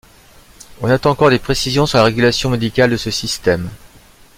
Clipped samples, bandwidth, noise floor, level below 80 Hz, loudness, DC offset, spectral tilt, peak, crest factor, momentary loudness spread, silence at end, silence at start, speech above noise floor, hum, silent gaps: under 0.1%; 16.5 kHz; -45 dBFS; -38 dBFS; -15 LUFS; under 0.1%; -5 dB/octave; 0 dBFS; 16 dB; 7 LU; 0.6 s; 0.7 s; 30 dB; none; none